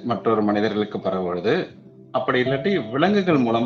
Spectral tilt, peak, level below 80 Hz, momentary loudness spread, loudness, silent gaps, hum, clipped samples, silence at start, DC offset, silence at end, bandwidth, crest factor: -5 dB/octave; -4 dBFS; -60 dBFS; 6 LU; -22 LUFS; none; none; under 0.1%; 0 s; under 0.1%; 0 s; 6.8 kHz; 18 dB